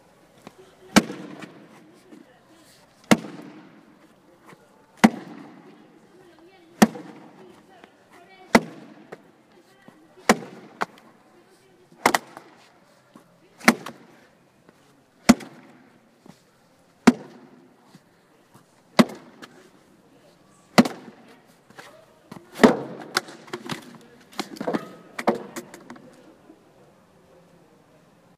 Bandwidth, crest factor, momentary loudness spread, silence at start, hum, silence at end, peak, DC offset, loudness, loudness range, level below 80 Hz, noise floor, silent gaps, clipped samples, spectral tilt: 15.5 kHz; 28 dB; 26 LU; 0.95 s; none; 2.45 s; 0 dBFS; under 0.1%; -23 LUFS; 5 LU; -60 dBFS; -58 dBFS; none; under 0.1%; -4.5 dB/octave